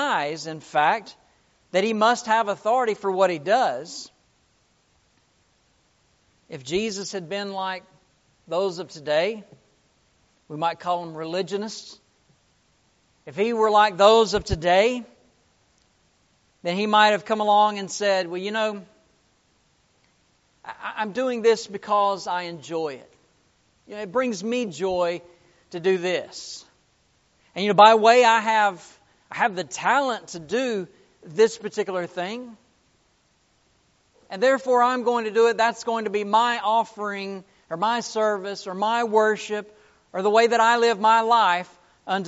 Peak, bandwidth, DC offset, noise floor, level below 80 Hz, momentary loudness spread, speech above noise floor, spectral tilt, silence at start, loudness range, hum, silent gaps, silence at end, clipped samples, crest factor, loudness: 0 dBFS; 8 kHz; under 0.1%; -65 dBFS; -54 dBFS; 18 LU; 43 dB; -2 dB/octave; 0 s; 11 LU; none; none; 0 s; under 0.1%; 24 dB; -22 LUFS